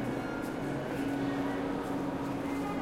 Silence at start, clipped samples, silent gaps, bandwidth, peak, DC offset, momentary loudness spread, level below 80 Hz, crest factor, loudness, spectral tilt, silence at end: 0 s; under 0.1%; none; 16 kHz; -20 dBFS; under 0.1%; 3 LU; -56 dBFS; 12 dB; -35 LUFS; -6.5 dB/octave; 0 s